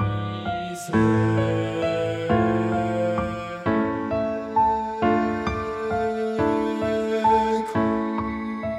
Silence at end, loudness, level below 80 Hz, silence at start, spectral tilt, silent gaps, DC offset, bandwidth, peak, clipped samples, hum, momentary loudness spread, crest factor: 0 s; -24 LUFS; -46 dBFS; 0 s; -7 dB/octave; none; under 0.1%; 13 kHz; -8 dBFS; under 0.1%; none; 8 LU; 14 dB